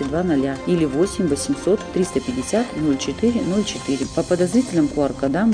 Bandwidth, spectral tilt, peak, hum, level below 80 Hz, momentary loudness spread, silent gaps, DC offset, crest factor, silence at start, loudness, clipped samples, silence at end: 10 kHz; -5.5 dB/octave; -6 dBFS; none; -42 dBFS; 4 LU; none; under 0.1%; 14 dB; 0 s; -21 LUFS; under 0.1%; 0 s